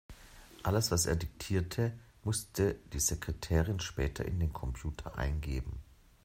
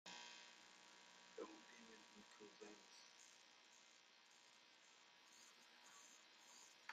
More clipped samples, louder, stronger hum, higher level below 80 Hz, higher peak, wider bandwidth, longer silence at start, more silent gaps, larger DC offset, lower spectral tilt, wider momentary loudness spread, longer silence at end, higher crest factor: neither; first, -35 LUFS vs -63 LUFS; neither; first, -44 dBFS vs under -90 dBFS; first, -16 dBFS vs -38 dBFS; about the same, 16 kHz vs 15 kHz; about the same, 0.1 s vs 0.05 s; neither; neither; first, -4.5 dB/octave vs -1 dB/octave; about the same, 10 LU vs 9 LU; first, 0.4 s vs 0 s; second, 20 dB vs 26 dB